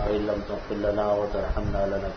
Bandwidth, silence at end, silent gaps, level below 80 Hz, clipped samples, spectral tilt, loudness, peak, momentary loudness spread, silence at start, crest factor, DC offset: 6.6 kHz; 0 s; none; -34 dBFS; under 0.1%; -7.5 dB/octave; -27 LUFS; -12 dBFS; 4 LU; 0 s; 14 dB; under 0.1%